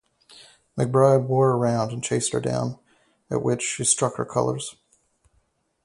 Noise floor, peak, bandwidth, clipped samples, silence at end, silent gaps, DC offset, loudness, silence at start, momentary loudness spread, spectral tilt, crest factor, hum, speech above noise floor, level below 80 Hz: -68 dBFS; -4 dBFS; 11.5 kHz; under 0.1%; 1.1 s; none; under 0.1%; -23 LUFS; 0.35 s; 12 LU; -5 dB/octave; 20 dB; none; 45 dB; -60 dBFS